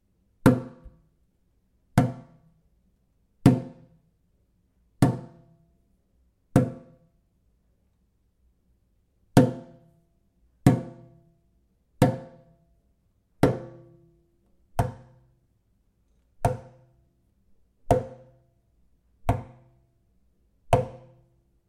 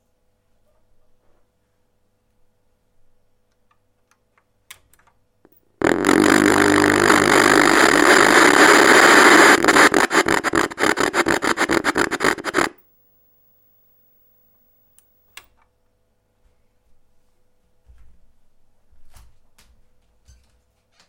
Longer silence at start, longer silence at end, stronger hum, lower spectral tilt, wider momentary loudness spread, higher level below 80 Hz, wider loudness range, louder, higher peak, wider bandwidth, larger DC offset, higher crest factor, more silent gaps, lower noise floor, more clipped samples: second, 0.45 s vs 5.8 s; second, 0.7 s vs 2 s; neither; first, -7.5 dB/octave vs -2.5 dB/octave; first, 22 LU vs 11 LU; about the same, -48 dBFS vs -50 dBFS; second, 6 LU vs 14 LU; second, -26 LUFS vs -14 LUFS; about the same, 0 dBFS vs 0 dBFS; about the same, 16 kHz vs 17 kHz; neither; first, 30 dB vs 20 dB; neither; about the same, -68 dBFS vs -65 dBFS; neither